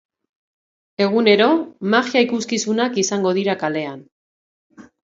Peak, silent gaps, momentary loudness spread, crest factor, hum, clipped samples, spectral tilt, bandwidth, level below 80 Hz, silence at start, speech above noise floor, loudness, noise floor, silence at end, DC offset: 0 dBFS; 4.12-4.70 s; 9 LU; 20 dB; none; under 0.1%; -4 dB/octave; 8 kHz; -68 dBFS; 1 s; over 72 dB; -18 LUFS; under -90 dBFS; 0.25 s; under 0.1%